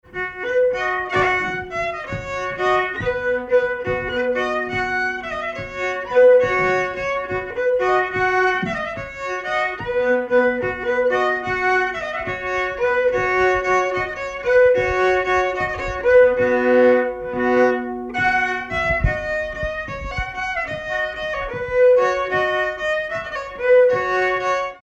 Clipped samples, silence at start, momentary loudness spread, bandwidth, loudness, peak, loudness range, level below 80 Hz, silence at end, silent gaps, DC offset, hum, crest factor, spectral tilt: under 0.1%; 0.1 s; 10 LU; 7.8 kHz; -19 LUFS; -4 dBFS; 4 LU; -40 dBFS; 0.05 s; none; under 0.1%; none; 14 dB; -5.5 dB/octave